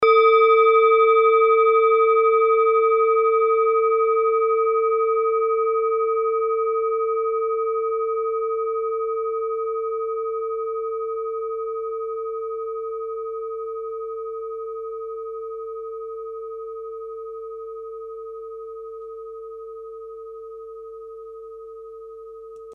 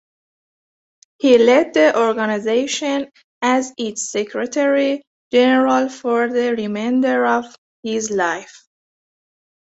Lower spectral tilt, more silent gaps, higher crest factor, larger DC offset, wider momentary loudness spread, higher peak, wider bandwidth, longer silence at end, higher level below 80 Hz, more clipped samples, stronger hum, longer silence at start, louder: about the same, -4.5 dB/octave vs -3.5 dB/octave; second, none vs 3.24-3.41 s, 5.07-5.31 s, 7.58-7.83 s; about the same, 16 dB vs 16 dB; neither; first, 22 LU vs 11 LU; second, -6 dBFS vs -2 dBFS; second, 5.2 kHz vs 8.2 kHz; second, 0 s vs 1.25 s; about the same, -66 dBFS vs -64 dBFS; neither; neither; second, 0 s vs 1.25 s; second, -21 LUFS vs -17 LUFS